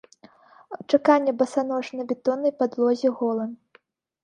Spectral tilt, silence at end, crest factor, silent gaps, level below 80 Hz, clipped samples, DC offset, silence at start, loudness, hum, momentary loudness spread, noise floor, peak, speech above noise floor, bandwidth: -5.5 dB/octave; 0.7 s; 20 dB; none; -76 dBFS; under 0.1%; under 0.1%; 0.7 s; -23 LUFS; none; 11 LU; -61 dBFS; -4 dBFS; 38 dB; 10 kHz